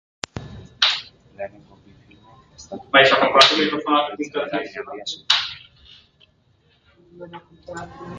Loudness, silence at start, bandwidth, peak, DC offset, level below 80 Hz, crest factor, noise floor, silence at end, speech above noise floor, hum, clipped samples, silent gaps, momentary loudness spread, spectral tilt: -18 LUFS; 0.35 s; 11.5 kHz; 0 dBFS; under 0.1%; -56 dBFS; 22 dB; -60 dBFS; 0 s; 40 dB; none; under 0.1%; none; 25 LU; -2.5 dB/octave